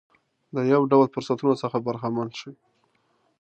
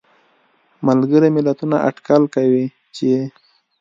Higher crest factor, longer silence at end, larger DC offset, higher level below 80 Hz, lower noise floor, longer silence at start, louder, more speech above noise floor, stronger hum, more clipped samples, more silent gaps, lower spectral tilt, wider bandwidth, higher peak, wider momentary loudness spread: about the same, 20 dB vs 16 dB; first, 0.9 s vs 0.5 s; neither; second, -72 dBFS vs -66 dBFS; first, -68 dBFS vs -58 dBFS; second, 0.55 s vs 0.8 s; second, -24 LUFS vs -17 LUFS; about the same, 45 dB vs 43 dB; neither; neither; neither; about the same, -7.5 dB/octave vs -8 dB/octave; first, 8.6 kHz vs 7.6 kHz; second, -6 dBFS vs 0 dBFS; first, 15 LU vs 9 LU